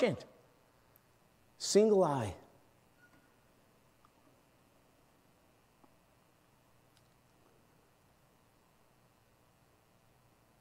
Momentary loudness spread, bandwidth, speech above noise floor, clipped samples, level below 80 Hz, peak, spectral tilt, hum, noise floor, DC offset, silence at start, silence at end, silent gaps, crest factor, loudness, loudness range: 24 LU; 16 kHz; 39 dB; under 0.1%; -76 dBFS; -14 dBFS; -5 dB/octave; none; -69 dBFS; under 0.1%; 0 s; 8.25 s; none; 26 dB; -31 LUFS; 6 LU